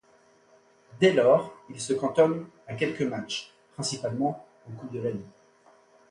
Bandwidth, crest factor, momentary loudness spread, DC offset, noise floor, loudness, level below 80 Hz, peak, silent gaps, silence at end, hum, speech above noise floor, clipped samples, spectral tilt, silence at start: 11.5 kHz; 20 dB; 19 LU; under 0.1%; -61 dBFS; -27 LUFS; -68 dBFS; -8 dBFS; none; 0.8 s; none; 34 dB; under 0.1%; -5 dB/octave; 0.95 s